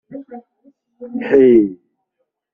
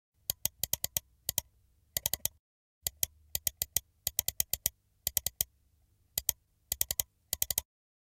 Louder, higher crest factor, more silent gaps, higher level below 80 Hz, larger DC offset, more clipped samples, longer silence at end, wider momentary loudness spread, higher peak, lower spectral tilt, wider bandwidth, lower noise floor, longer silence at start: first, -13 LUFS vs -34 LUFS; second, 16 dB vs 30 dB; second, none vs 2.39-2.81 s; about the same, -54 dBFS vs -56 dBFS; neither; neither; first, 0.8 s vs 0.5 s; first, 24 LU vs 7 LU; first, -2 dBFS vs -8 dBFS; first, -7 dB/octave vs 0 dB/octave; second, 3.4 kHz vs 17 kHz; about the same, -73 dBFS vs -70 dBFS; second, 0.1 s vs 0.3 s